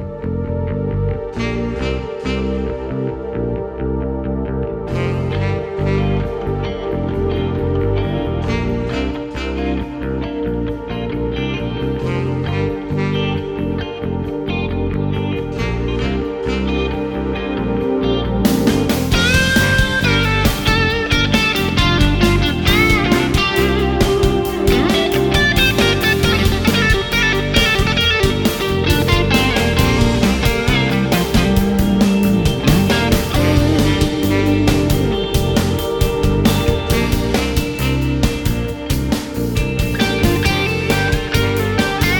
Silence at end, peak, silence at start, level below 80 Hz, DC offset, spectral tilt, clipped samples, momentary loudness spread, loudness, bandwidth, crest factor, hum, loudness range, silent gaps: 0 s; 0 dBFS; 0 s; -24 dBFS; under 0.1%; -5.5 dB/octave; under 0.1%; 8 LU; -17 LUFS; 18 kHz; 16 dB; none; 7 LU; none